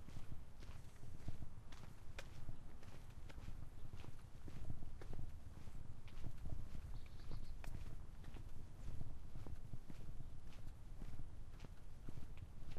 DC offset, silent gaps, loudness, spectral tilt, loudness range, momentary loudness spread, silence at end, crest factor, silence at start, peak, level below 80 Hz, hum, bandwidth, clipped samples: under 0.1%; none; -57 LUFS; -6 dB/octave; 2 LU; 5 LU; 0 s; 14 dB; 0 s; -30 dBFS; -52 dBFS; none; 7.8 kHz; under 0.1%